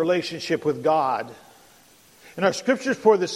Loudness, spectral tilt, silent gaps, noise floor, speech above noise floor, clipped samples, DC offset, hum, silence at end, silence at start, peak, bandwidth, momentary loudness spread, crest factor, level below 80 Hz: -23 LUFS; -4.5 dB/octave; none; -54 dBFS; 32 dB; under 0.1%; under 0.1%; none; 0 s; 0 s; -6 dBFS; 14 kHz; 10 LU; 18 dB; -68 dBFS